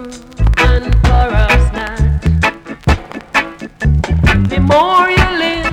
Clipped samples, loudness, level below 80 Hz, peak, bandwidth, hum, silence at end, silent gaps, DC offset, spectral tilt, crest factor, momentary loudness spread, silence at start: under 0.1%; -13 LUFS; -16 dBFS; -2 dBFS; 11.5 kHz; none; 0 s; none; under 0.1%; -6 dB/octave; 10 dB; 8 LU; 0 s